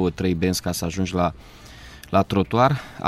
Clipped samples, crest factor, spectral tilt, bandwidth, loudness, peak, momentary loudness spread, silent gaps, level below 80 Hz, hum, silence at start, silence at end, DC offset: under 0.1%; 18 dB; -5.5 dB/octave; 15.5 kHz; -22 LUFS; -6 dBFS; 22 LU; none; -44 dBFS; none; 0 s; 0 s; under 0.1%